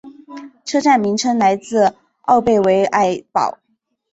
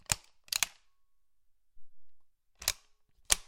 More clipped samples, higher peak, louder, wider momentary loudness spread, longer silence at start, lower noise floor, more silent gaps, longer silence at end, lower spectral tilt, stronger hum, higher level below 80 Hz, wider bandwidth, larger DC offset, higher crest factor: neither; about the same, -2 dBFS vs -4 dBFS; first, -16 LUFS vs -34 LUFS; first, 16 LU vs 4 LU; about the same, 0.05 s vs 0.1 s; second, -36 dBFS vs -77 dBFS; neither; first, 0.6 s vs 0.05 s; first, -4.5 dB/octave vs 0.5 dB/octave; neither; about the same, -56 dBFS vs -56 dBFS; second, 8.2 kHz vs 17 kHz; neither; second, 16 dB vs 34 dB